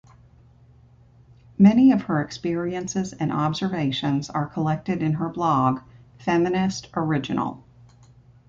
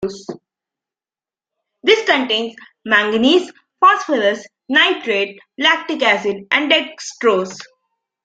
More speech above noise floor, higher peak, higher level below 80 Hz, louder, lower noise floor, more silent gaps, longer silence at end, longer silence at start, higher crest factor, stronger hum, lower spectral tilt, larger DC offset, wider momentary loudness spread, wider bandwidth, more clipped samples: second, 31 dB vs over 74 dB; second, -4 dBFS vs 0 dBFS; first, -56 dBFS vs -62 dBFS; second, -23 LUFS vs -15 LUFS; second, -53 dBFS vs under -90 dBFS; neither; first, 0.9 s vs 0.6 s; first, 1.6 s vs 0 s; about the same, 18 dB vs 18 dB; neither; first, -6.5 dB/octave vs -3 dB/octave; neither; second, 10 LU vs 15 LU; second, 7.8 kHz vs 9.2 kHz; neither